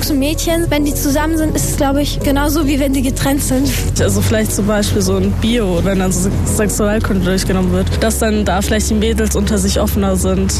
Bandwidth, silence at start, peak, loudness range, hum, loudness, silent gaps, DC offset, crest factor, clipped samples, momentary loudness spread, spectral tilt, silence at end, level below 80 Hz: 14 kHz; 0 s; -4 dBFS; 0 LU; none; -15 LUFS; none; under 0.1%; 10 dB; under 0.1%; 1 LU; -5 dB/octave; 0 s; -22 dBFS